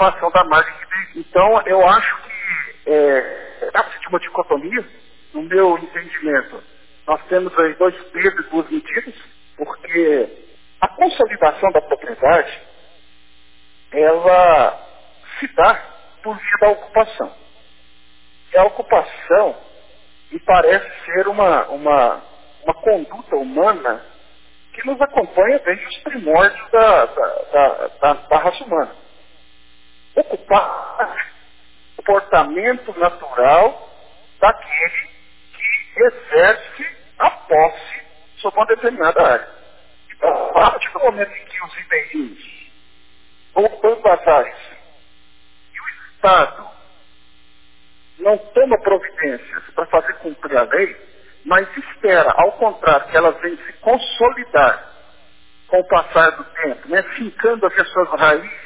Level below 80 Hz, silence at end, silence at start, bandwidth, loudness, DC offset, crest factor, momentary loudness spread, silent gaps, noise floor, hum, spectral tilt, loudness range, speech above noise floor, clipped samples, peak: -48 dBFS; 0.05 s; 0 s; 4 kHz; -16 LUFS; 0.7%; 16 dB; 14 LU; none; -53 dBFS; none; -8 dB/octave; 5 LU; 38 dB; under 0.1%; -2 dBFS